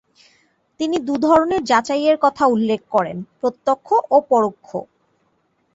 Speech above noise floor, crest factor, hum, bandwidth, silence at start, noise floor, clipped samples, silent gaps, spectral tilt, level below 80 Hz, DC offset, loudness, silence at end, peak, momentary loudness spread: 47 dB; 18 dB; none; 8 kHz; 0.8 s; -65 dBFS; under 0.1%; none; -5.5 dB/octave; -58 dBFS; under 0.1%; -18 LUFS; 0.9 s; -2 dBFS; 11 LU